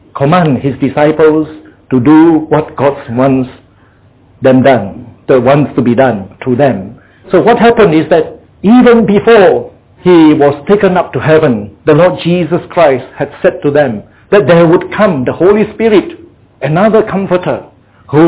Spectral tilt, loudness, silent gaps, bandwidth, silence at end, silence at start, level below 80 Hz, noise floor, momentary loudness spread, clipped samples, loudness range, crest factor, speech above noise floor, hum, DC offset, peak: -11.5 dB/octave; -8 LUFS; none; 4 kHz; 0 s; 0.15 s; -40 dBFS; -44 dBFS; 10 LU; 0.7%; 4 LU; 8 dB; 36 dB; none; under 0.1%; 0 dBFS